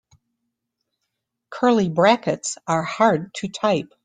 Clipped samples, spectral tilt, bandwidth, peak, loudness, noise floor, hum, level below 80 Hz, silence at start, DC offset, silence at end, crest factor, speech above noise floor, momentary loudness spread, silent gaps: under 0.1%; -5 dB/octave; 9.6 kHz; -2 dBFS; -20 LUFS; -79 dBFS; none; -62 dBFS; 1.5 s; under 0.1%; 0.2 s; 20 dB; 59 dB; 9 LU; none